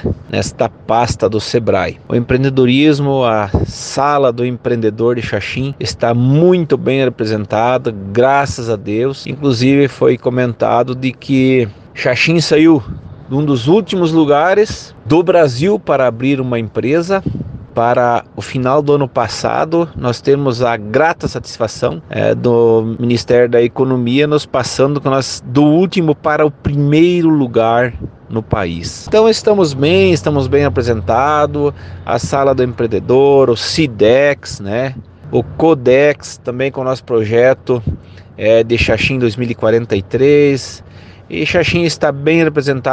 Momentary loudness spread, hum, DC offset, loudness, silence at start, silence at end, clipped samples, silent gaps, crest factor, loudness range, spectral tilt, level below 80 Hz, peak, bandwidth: 9 LU; none; under 0.1%; -13 LUFS; 0 s; 0 s; under 0.1%; none; 12 dB; 2 LU; -6 dB/octave; -38 dBFS; 0 dBFS; 9.6 kHz